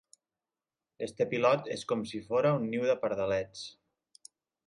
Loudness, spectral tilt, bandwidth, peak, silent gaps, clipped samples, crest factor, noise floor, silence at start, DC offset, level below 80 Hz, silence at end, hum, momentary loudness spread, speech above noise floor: -31 LUFS; -6 dB/octave; 11.5 kHz; -14 dBFS; none; under 0.1%; 20 dB; under -90 dBFS; 1 s; under 0.1%; -68 dBFS; 0.95 s; none; 13 LU; over 60 dB